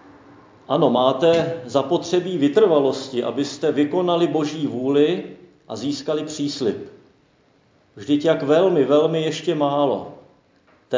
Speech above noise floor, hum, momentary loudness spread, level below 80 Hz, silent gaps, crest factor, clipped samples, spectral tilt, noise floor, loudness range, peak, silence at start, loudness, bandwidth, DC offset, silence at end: 39 dB; none; 10 LU; -64 dBFS; none; 18 dB; under 0.1%; -6 dB/octave; -58 dBFS; 5 LU; -2 dBFS; 0.7 s; -20 LUFS; 7.6 kHz; under 0.1%; 0 s